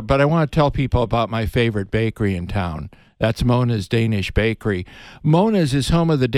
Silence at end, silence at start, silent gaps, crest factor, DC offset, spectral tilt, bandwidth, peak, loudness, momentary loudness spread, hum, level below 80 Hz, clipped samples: 0 s; 0 s; none; 16 dB; under 0.1%; -7 dB/octave; 13.5 kHz; -2 dBFS; -19 LUFS; 8 LU; none; -34 dBFS; under 0.1%